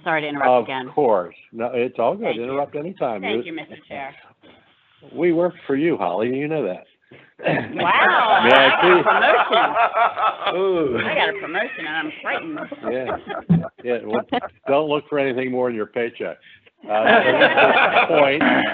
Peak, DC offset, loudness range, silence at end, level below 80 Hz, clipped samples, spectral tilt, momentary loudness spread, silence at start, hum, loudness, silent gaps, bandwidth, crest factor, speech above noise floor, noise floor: 0 dBFS; under 0.1%; 10 LU; 0 s; -62 dBFS; under 0.1%; -7.5 dB/octave; 14 LU; 0.05 s; none; -19 LUFS; none; 5.4 kHz; 20 dB; 36 dB; -55 dBFS